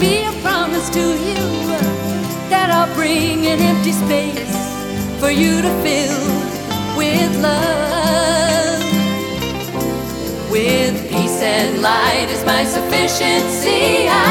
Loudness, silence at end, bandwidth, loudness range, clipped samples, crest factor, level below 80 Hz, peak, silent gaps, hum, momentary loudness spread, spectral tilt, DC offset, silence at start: -16 LUFS; 0 s; 19 kHz; 2 LU; under 0.1%; 16 dB; -38 dBFS; 0 dBFS; none; none; 7 LU; -4 dB/octave; under 0.1%; 0 s